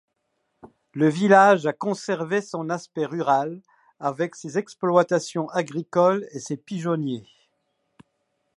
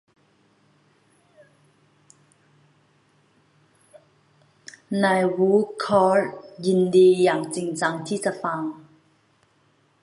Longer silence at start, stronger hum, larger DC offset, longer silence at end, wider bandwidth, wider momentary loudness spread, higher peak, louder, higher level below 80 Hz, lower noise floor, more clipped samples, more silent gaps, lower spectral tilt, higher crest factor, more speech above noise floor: second, 0.65 s vs 4.9 s; neither; neither; about the same, 1.35 s vs 1.25 s; about the same, 11.5 kHz vs 11.5 kHz; about the same, 14 LU vs 14 LU; first, -2 dBFS vs -6 dBFS; about the same, -23 LUFS vs -21 LUFS; second, -76 dBFS vs -70 dBFS; first, -75 dBFS vs -63 dBFS; neither; neither; about the same, -6 dB/octave vs -6 dB/octave; about the same, 22 dB vs 18 dB; first, 52 dB vs 43 dB